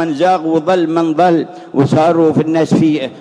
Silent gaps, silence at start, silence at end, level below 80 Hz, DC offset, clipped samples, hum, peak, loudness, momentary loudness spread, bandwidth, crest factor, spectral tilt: none; 0 s; 0 s; -54 dBFS; under 0.1%; under 0.1%; none; 0 dBFS; -13 LUFS; 4 LU; 10 kHz; 12 dB; -7.5 dB/octave